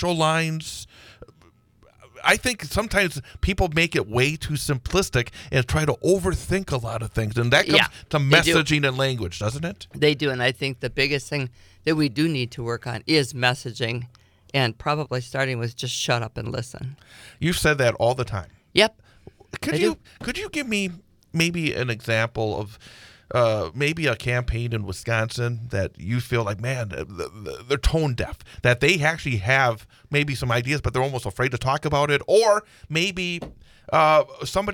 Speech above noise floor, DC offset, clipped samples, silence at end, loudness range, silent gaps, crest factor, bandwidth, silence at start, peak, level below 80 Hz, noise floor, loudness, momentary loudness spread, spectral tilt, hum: 34 dB; under 0.1%; under 0.1%; 0 s; 6 LU; none; 24 dB; 19.5 kHz; 0 s; 0 dBFS; -40 dBFS; -57 dBFS; -23 LUFS; 12 LU; -4.5 dB/octave; none